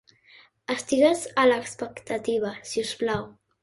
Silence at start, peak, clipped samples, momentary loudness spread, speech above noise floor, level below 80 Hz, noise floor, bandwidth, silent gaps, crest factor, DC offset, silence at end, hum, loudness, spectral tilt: 0.7 s; -8 dBFS; under 0.1%; 14 LU; 31 dB; -64 dBFS; -56 dBFS; 11.5 kHz; none; 18 dB; under 0.1%; 0.3 s; none; -25 LUFS; -3.5 dB/octave